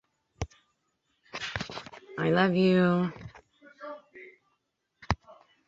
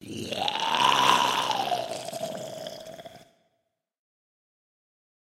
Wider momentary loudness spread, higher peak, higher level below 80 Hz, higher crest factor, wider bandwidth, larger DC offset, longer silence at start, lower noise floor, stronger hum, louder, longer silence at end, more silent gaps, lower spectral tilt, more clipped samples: first, 23 LU vs 19 LU; second, -8 dBFS vs -2 dBFS; first, -52 dBFS vs -70 dBFS; about the same, 24 dB vs 28 dB; second, 7.6 kHz vs 16.5 kHz; neither; first, 0.4 s vs 0 s; about the same, -78 dBFS vs -78 dBFS; neither; second, -28 LUFS vs -25 LUFS; second, 0.35 s vs 2.1 s; neither; first, -7 dB/octave vs -2 dB/octave; neither